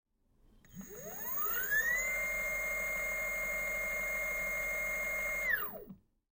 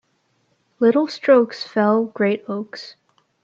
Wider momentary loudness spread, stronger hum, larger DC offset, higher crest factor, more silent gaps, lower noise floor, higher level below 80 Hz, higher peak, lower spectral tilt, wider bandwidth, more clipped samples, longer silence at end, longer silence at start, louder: second, 10 LU vs 16 LU; neither; neither; about the same, 16 dB vs 18 dB; neither; about the same, -68 dBFS vs -66 dBFS; first, -56 dBFS vs -72 dBFS; second, -20 dBFS vs -4 dBFS; second, -1.5 dB/octave vs -6.5 dB/octave; first, 16.5 kHz vs 7.6 kHz; neither; second, 0.35 s vs 0.55 s; second, 0.65 s vs 0.8 s; second, -33 LUFS vs -19 LUFS